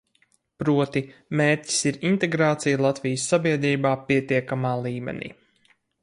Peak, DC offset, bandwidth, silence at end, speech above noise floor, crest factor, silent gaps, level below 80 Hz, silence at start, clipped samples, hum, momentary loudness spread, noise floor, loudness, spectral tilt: -8 dBFS; under 0.1%; 11.5 kHz; 0.75 s; 43 dB; 16 dB; none; -62 dBFS; 0.6 s; under 0.1%; none; 9 LU; -66 dBFS; -23 LUFS; -5 dB/octave